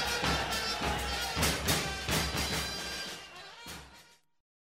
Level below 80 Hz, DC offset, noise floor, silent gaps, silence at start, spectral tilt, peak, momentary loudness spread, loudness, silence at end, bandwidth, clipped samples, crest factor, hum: -44 dBFS; under 0.1%; -59 dBFS; none; 0 s; -2.5 dB/octave; -14 dBFS; 16 LU; -31 LUFS; 0.65 s; 16 kHz; under 0.1%; 20 dB; none